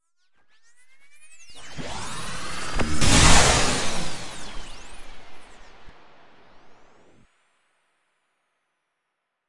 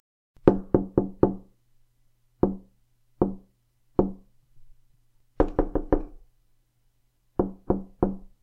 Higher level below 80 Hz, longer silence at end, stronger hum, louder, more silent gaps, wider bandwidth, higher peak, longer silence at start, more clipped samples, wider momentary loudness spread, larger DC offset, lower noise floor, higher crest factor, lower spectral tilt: about the same, -34 dBFS vs -38 dBFS; second, 0 s vs 0.25 s; neither; first, -21 LUFS vs -27 LUFS; neither; first, 11.5 kHz vs 4.6 kHz; about the same, 0 dBFS vs 0 dBFS; second, 0 s vs 0.45 s; neither; first, 28 LU vs 9 LU; neither; first, -79 dBFS vs -67 dBFS; about the same, 24 dB vs 28 dB; second, -2.5 dB/octave vs -11.5 dB/octave